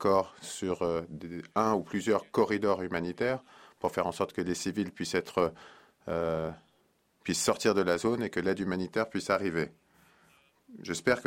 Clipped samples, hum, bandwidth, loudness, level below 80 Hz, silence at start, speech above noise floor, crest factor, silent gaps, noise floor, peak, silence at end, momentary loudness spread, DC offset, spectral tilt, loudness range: under 0.1%; none; 16 kHz; -31 LUFS; -64 dBFS; 0 s; 40 dB; 20 dB; none; -70 dBFS; -12 dBFS; 0 s; 10 LU; under 0.1%; -4.5 dB/octave; 3 LU